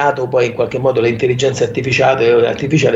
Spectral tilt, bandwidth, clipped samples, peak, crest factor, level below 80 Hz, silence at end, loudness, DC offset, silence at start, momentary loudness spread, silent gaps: -5.5 dB/octave; 8 kHz; under 0.1%; 0 dBFS; 12 dB; -48 dBFS; 0 s; -14 LUFS; under 0.1%; 0 s; 4 LU; none